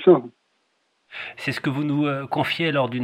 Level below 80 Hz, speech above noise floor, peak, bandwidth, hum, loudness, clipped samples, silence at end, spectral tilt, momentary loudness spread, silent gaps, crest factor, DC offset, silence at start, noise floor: -68 dBFS; 48 dB; -4 dBFS; 14 kHz; none; -23 LUFS; under 0.1%; 0 s; -7 dB/octave; 15 LU; none; 20 dB; under 0.1%; 0 s; -69 dBFS